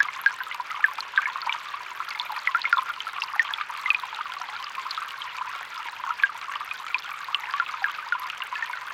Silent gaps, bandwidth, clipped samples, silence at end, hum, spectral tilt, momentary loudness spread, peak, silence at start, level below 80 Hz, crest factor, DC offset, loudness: none; 17 kHz; under 0.1%; 0 s; none; 2 dB/octave; 9 LU; -6 dBFS; 0 s; -76 dBFS; 24 dB; under 0.1%; -28 LUFS